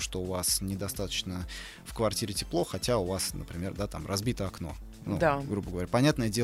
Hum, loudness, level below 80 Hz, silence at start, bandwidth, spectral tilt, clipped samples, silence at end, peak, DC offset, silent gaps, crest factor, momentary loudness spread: none; -31 LUFS; -46 dBFS; 0 s; 16 kHz; -4.5 dB/octave; under 0.1%; 0 s; -12 dBFS; under 0.1%; none; 20 dB; 12 LU